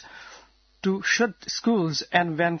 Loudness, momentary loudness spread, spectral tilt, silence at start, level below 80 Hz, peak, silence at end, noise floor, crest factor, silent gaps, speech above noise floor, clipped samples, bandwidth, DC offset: -24 LUFS; 10 LU; -4 dB/octave; 0.05 s; -64 dBFS; -6 dBFS; 0 s; -53 dBFS; 20 dB; none; 29 dB; under 0.1%; 6.6 kHz; under 0.1%